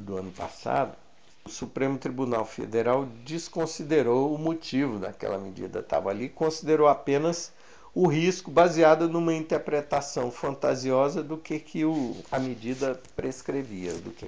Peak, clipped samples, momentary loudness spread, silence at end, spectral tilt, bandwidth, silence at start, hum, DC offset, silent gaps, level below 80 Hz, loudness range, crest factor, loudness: -6 dBFS; under 0.1%; 13 LU; 0 s; -5.5 dB/octave; 8 kHz; 0 s; none; 0.3%; none; -58 dBFS; 6 LU; 22 dB; -27 LUFS